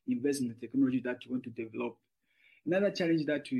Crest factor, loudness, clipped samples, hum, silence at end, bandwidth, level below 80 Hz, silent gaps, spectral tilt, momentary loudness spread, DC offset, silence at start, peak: 14 dB; -33 LUFS; under 0.1%; none; 0 s; 12.5 kHz; -78 dBFS; none; -6 dB/octave; 10 LU; under 0.1%; 0.05 s; -18 dBFS